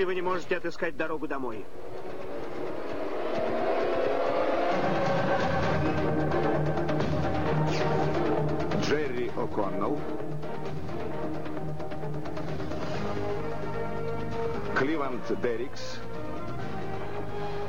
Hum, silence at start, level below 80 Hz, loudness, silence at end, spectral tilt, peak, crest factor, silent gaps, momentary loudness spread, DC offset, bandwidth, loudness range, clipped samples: none; 0 s; -50 dBFS; -31 LUFS; 0 s; -7 dB/octave; -14 dBFS; 14 dB; none; 9 LU; 3%; 16 kHz; 7 LU; under 0.1%